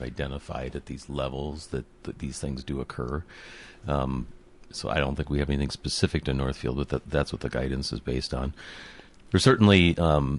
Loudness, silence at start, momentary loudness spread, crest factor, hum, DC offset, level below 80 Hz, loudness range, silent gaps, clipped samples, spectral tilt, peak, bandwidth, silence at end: -27 LUFS; 0 s; 19 LU; 20 dB; none; under 0.1%; -38 dBFS; 9 LU; none; under 0.1%; -6 dB/octave; -6 dBFS; 11.5 kHz; 0 s